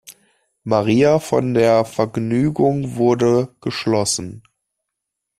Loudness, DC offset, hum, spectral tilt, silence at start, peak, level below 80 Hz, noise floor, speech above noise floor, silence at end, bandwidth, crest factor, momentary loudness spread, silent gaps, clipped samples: -18 LUFS; under 0.1%; none; -5.5 dB/octave; 0.1 s; -2 dBFS; -52 dBFS; -80 dBFS; 63 dB; 1 s; 14 kHz; 16 dB; 9 LU; none; under 0.1%